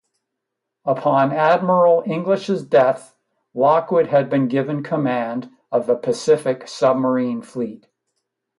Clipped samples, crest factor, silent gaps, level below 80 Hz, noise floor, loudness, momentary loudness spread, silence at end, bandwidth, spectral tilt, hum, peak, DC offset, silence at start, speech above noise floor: under 0.1%; 16 dB; none; -68 dBFS; -80 dBFS; -19 LUFS; 11 LU; 0.85 s; 11.5 kHz; -6.5 dB/octave; none; -4 dBFS; under 0.1%; 0.85 s; 62 dB